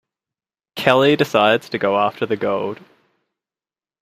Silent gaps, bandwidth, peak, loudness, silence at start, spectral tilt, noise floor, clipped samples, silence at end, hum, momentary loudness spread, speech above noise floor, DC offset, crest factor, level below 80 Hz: none; 15 kHz; 0 dBFS; -18 LUFS; 0.75 s; -5.5 dB/octave; under -90 dBFS; under 0.1%; 1.3 s; none; 13 LU; over 73 dB; under 0.1%; 20 dB; -64 dBFS